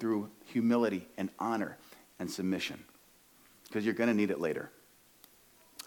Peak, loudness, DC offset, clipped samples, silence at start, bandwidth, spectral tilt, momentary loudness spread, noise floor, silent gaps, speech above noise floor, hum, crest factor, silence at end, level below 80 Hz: -18 dBFS; -34 LUFS; under 0.1%; under 0.1%; 0 s; 19 kHz; -5.5 dB/octave; 14 LU; -63 dBFS; none; 30 dB; none; 18 dB; 0 s; -76 dBFS